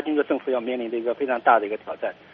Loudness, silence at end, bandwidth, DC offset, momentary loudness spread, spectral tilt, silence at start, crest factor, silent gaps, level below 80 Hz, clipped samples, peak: -24 LUFS; 0.2 s; 4.9 kHz; under 0.1%; 11 LU; -2 dB/octave; 0 s; 20 dB; none; -70 dBFS; under 0.1%; -4 dBFS